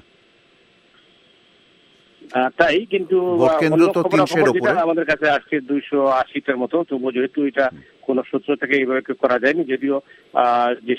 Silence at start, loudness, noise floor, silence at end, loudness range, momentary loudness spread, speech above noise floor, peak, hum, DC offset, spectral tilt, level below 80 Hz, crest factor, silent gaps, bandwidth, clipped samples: 2.25 s; -19 LUFS; -55 dBFS; 0 s; 4 LU; 7 LU; 37 dB; 0 dBFS; none; under 0.1%; -6 dB/octave; -60 dBFS; 20 dB; none; 13 kHz; under 0.1%